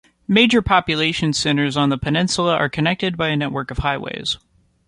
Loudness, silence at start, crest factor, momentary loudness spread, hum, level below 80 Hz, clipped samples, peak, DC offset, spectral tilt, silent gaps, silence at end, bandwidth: -18 LUFS; 0.3 s; 18 dB; 9 LU; none; -40 dBFS; under 0.1%; -2 dBFS; under 0.1%; -4.5 dB/octave; none; 0.5 s; 11.5 kHz